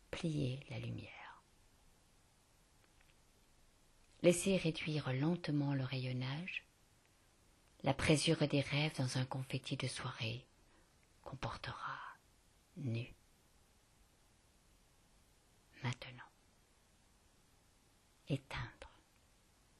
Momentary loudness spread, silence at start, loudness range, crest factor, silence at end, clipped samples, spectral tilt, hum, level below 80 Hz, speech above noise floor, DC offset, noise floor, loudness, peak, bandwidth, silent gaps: 19 LU; 0.15 s; 15 LU; 26 dB; 0.9 s; under 0.1%; -5 dB/octave; none; -66 dBFS; 32 dB; under 0.1%; -71 dBFS; -39 LUFS; -18 dBFS; 12.5 kHz; none